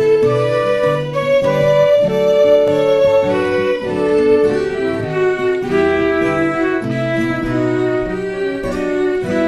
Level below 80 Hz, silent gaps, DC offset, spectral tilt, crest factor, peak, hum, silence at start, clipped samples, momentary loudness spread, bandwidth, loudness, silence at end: -42 dBFS; none; under 0.1%; -7 dB/octave; 12 dB; -2 dBFS; none; 0 s; under 0.1%; 6 LU; 13 kHz; -15 LUFS; 0 s